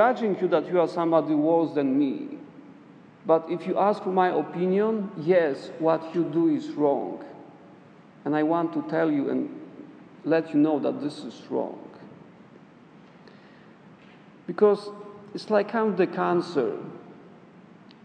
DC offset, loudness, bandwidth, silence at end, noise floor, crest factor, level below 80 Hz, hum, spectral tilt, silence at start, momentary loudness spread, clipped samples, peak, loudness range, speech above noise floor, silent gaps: under 0.1%; -25 LUFS; 9 kHz; 0.75 s; -51 dBFS; 18 dB; -80 dBFS; none; -8 dB/octave; 0 s; 18 LU; under 0.1%; -8 dBFS; 6 LU; 27 dB; none